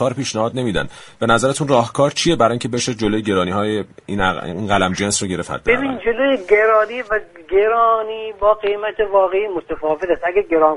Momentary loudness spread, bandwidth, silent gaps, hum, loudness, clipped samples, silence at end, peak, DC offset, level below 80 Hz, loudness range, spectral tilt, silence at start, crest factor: 8 LU; 11.5 kHz; none; none; -18 LUFS; under 0.1%; 0 s; 0 dBFS; under 0.1%; -42 dBFS; 2 LU; -4.5 dB/octave; 0 s; 16 dB